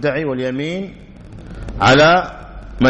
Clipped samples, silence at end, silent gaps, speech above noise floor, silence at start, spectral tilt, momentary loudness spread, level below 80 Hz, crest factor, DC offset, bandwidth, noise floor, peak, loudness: under 0.1%; 0 s; none; 20 dB; 0 s; -5.5 dB/octave; 25 LU; -36 dBFS; 14 dB; under 0.1%; 8.4 kHz; -35 dBFS; -2 dBFS; -15 LUFS